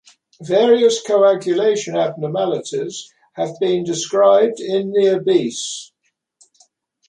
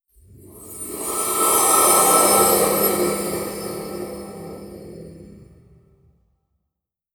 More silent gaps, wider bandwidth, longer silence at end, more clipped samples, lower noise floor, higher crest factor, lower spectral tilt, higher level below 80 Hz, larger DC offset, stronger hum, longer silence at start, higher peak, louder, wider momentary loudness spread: neither; second, 10.5 kHz vs over 20 kHz; second, 1.25 s vs 1.8 s; neither; second, -59 dBFS vs -81 dBFS; about the same, 16 dB vs 18 dB; first, -4.5 dB/octave vs -2 dB/octave; second, -68 dBFS vs -52 dBFS; neither; neither; about the same, 0.4 s vs 0.45 s; about the same, -2 dBFS vs -2 dBFS; about the same, -17 LUFS vs -16 LUFS; second, 13 LU vs 24 LU